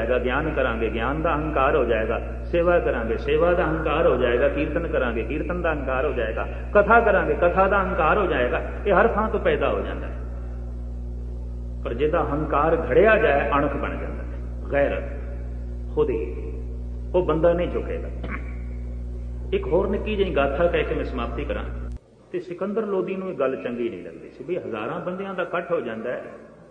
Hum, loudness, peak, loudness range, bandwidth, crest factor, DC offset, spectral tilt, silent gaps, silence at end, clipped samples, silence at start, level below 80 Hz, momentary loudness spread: none; -23 LUFS; -4 dBFS; 7 LU; 5 kHz; 20 dB; under 0.1%; -8.5 dB/octave; none; 0.05 s; under 0.1%; 0 s; -32 dBFS; 14 LU